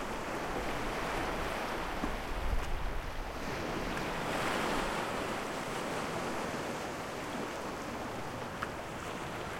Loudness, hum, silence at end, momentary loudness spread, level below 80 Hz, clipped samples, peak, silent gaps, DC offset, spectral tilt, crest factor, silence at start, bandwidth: -37 LUFS; none; 0 s; 6 LU; -44 dBFS; under 0.1%; -20 dBFS; none; under 0.1%; -4.5 dB/octave; 18 dB; 0 s; 16.5 kHz